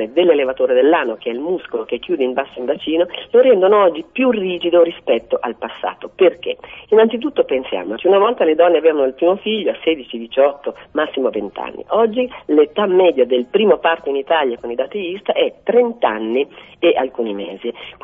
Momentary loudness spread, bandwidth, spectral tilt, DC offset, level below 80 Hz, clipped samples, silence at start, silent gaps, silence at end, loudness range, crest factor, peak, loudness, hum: 11 LU; 3.8 kHz; -8 dB/octave; under 0.1%; -58 dBFS; under 0.1%; 0 s; none; 0 s; 3 LU; 16 dB; 0 dBFS; -16 LUFS; none